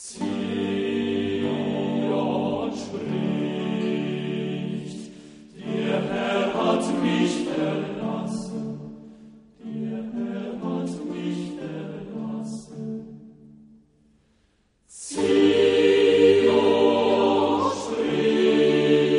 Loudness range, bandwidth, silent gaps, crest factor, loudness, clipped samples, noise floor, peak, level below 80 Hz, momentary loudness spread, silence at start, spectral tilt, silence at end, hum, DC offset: 13 LU; 10.5 kHz; none; 18 dB; -23 LUFS; under 0.1%; -65 dBFS; -6 dBFS; -62 dBFS; 16 LU; 0 s; -6 dB/octave; 0 s; none; under 0.1%